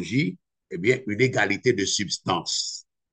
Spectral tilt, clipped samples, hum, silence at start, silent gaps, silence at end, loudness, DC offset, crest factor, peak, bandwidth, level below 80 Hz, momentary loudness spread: -4 dB/octave; under 0.1%; none; 0 s; none; 0.3 s; -24 LUFS; under 0.1%; 18 dB; -6 dBFS; 9.2 kHz; -64 dBFS; 8 LU